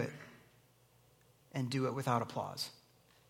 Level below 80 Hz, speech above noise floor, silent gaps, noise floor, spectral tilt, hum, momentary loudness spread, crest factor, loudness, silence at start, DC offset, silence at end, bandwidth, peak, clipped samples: -78 dBFS; 31 dB; none; -68 dBFS; -5.5 dB/octave; none; 13 LU; 22 dB; -38 LUFS; 0 s; under 0.1%; 0.55 s; 16.5 kHz; -20 dBFS; under 0.1%